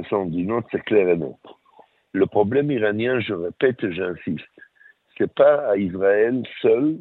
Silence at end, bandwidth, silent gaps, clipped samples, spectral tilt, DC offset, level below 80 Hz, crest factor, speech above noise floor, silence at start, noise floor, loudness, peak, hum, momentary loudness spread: 0 s; 4.1 kHz; none; under 0.1%; -10 dB/octave; under 0.1%; -60 dBFS; 18 dB; 34 dB; 0 s; -55 dBFS; -21 LUFS; -4 dBFS; none; 10 LU